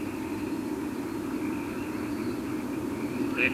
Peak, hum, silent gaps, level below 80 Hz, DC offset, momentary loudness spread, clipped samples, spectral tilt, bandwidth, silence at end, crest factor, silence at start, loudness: -12 dBFS; none; none; -56 dBFS; under 0.1%; 3 LU; under 0.1%; -5.5 dB/octave; 16 kHz; 0 s; 20 dB; 0 s; -32 LUFS